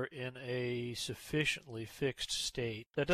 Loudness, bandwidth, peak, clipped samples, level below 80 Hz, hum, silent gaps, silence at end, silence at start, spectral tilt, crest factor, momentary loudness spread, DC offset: -38 LUFS; 14 kHz; -20 dBFS; under 0.1%; -62 dBFS; none; 2.87-2.91 s; 0 s; 0 s; -4 dB/octave; 16 dB; 7 LU; under 0.1%